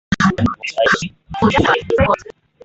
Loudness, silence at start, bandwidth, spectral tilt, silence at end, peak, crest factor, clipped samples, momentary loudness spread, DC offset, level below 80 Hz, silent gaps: -16 LUFS; 0.1 s; 8.2 kHz; -5.5 dB/octave; 0.4 s; -2 dBFS; 16 dB; under 0.1%; 5 LU; under 0.1%; -36 dBFS; none